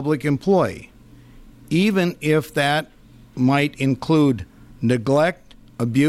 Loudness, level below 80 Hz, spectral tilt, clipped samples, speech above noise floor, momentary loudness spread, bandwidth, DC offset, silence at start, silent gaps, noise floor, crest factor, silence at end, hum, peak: -20 LUFS; -50 dBFS; -6.5 dB/octave; under 0.1%; 27 dB; 13 LU; 15 kHz; under 0.1%; 0 s; none; -46 dBFS; 14 dB; 0 s; none; -8 dBFS